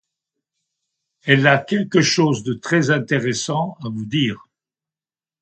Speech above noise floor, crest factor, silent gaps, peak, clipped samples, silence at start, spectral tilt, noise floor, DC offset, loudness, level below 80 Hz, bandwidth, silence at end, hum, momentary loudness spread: over 72 dB; 20 dB; none; 0 dBFS; under 0.1%; 1.25 s; -5 dB/octave; under -90 dBFS; under 0.1%; -18 LUFS; -60 dBFS; 9 kHz; 1.05 s; none; 10 LU